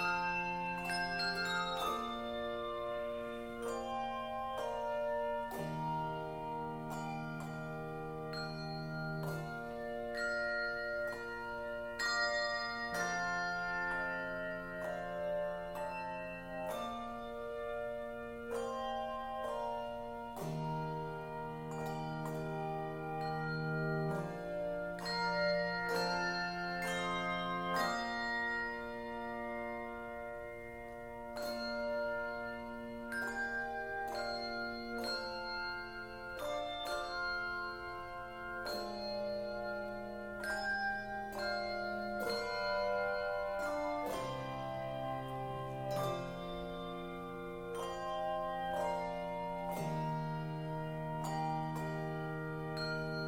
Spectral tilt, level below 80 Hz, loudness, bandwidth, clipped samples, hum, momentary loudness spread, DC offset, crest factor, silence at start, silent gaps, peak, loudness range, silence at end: -5 dB/octave; -60 dBFS; -39 LUFS; 16.5 kHz; under 0.1%; none; 8 LU; under 0.1%; 18 dB; 0 s; none; -22 dBFS; 5 LU; 0 s